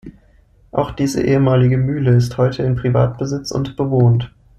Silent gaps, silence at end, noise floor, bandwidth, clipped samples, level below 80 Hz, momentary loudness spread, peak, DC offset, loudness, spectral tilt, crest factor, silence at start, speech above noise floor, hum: none; 0.3 s; -51 dBFS; 10 kHz; under 0.1%; -40 dBFS; 8 LU; -2 dBFS; under 0.1%; -17 LUFS; -7.5 dB/octave; 14 dB; 0.05 s; 35 dB; none